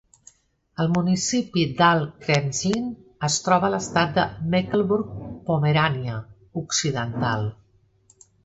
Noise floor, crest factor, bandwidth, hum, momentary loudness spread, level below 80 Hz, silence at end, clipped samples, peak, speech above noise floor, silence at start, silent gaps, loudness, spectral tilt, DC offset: -59 dBFS; 20 dB; 8.2 kHz; none; 13 LU; -52 dBFS; 0.9 s; under 0.1%; -4 dBFS; 37 dB; 0.8 s; none; -23 LUFS; -4.5 dB/octave; under 0.1%